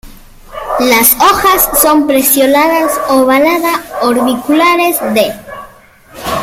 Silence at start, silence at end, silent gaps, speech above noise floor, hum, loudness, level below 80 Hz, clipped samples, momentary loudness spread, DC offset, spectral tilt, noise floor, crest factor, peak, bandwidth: 0.05 s; 0 s; none; 30 dB; none; -9 LUFS; -38 dBFS; 0.2%; 14 LU; under 0.1%; -2.5 dB/octave; -39 dBFS; 10 dB; 0 dBFS; over 20 kHz